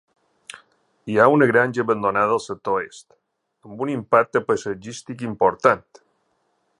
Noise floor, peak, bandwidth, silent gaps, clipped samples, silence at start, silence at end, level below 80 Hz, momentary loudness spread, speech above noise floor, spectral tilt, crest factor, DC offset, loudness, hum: -69 dBFS; 0 dBFS; 11 kHz; none; under 0.1%; 1.05 s; 1 s; -62 dBFS; 20 LU; 48 dB; -6 dB/octave; 22 dB; under 0.1%; -20 LUFS; none